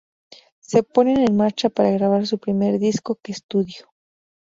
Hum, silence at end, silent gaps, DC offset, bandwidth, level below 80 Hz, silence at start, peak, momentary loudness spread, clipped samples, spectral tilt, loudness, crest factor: none; 0.8 s; 3.43-3.49 s; under 0.1%; 7.8 kHz; -60 dBFS; 0.7 s; -2 dBFS; 10 LU; under 0.1%; -6.5 dB/octave; -20 LUFS; 18 dB